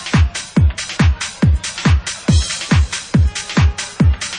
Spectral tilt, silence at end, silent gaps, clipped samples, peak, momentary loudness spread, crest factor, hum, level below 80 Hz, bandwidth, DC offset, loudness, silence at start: -5 dB/octave; 0 s; none; under 0.1%; -2 dBFS; 1 LU; 12 dB; none; -22 dBFS; 10.5 kHz; under 0.1%; -16 LUFS; 0 s